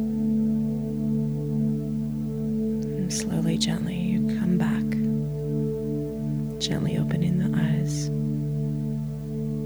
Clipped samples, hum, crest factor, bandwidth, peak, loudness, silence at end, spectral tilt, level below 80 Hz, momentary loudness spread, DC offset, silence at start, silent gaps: under 0.1%; 60 Hz at -40 dBFS; 14 dB; over 20 kHz; -10 dBFS; -26 LUFS; 0 s; -6.5 dB/octave; -46 dBFS; 5 LU; under 0.1%; 0 s; none